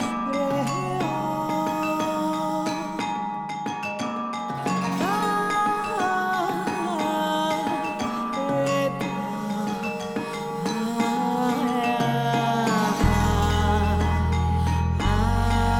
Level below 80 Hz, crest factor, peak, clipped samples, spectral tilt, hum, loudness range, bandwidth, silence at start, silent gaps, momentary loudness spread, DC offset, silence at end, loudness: -36 dBFS; 14 dB; -8 dBFS; under 0.1%; -6 dB/octave; none; 4 LU; 17.5 kHz; 0 s; none; 7 LU; under 0.1%; 0 s; -25 LUFS